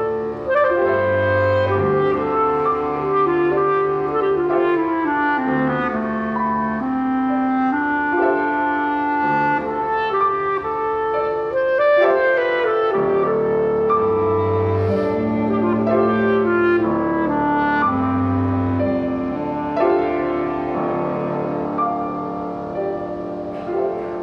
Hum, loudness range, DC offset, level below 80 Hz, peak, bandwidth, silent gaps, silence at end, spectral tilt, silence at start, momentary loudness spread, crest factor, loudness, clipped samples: none; 3 LU; under 0.1%; -48 dBFS; -4 dBFS; 6.2 kHz; none; 0 s; -9 dB/octave; 0 s; 6 LU; 14 dB; -19 LUFS; under 0.1%